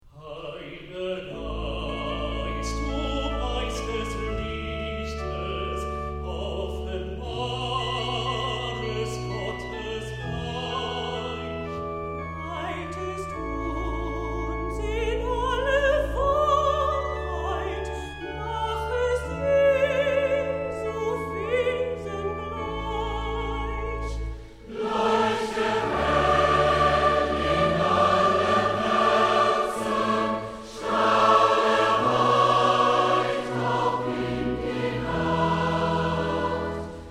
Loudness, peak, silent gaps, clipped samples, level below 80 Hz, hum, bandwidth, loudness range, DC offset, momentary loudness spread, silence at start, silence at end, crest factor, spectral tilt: -25 LUFS; -6 dBFS; none; under 0.1%; -38 dBFS; none; 14 kHz; 10 LU; under 0.1%; 12 LU; 0.05 s; 0 s; 18 dB; -5.5 dB/octave